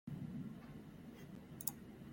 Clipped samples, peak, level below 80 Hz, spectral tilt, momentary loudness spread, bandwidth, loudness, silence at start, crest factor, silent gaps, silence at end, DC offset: under 0.1%; -22 dBFS; -70 dBFS; -5 dB/octave; 11 LU; 16.5 kHz; -49 LUFS; 0.05 s; 28 dB; none; 0 s; under 0.1%